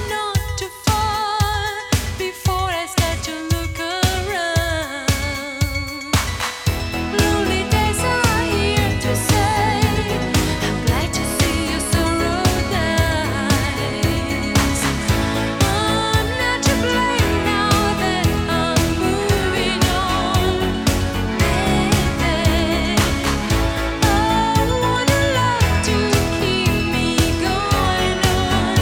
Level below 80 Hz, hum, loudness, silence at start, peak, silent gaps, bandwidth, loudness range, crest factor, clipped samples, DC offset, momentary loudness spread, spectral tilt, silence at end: -28 dBFS; none; -18 LUFS; 0 s; -2 dBFS; none; 18.5 kHz; 3 LU; 16 dB; under 0.1%; under 0.1%; 5 LU; -4.5 dB/octave; 0 s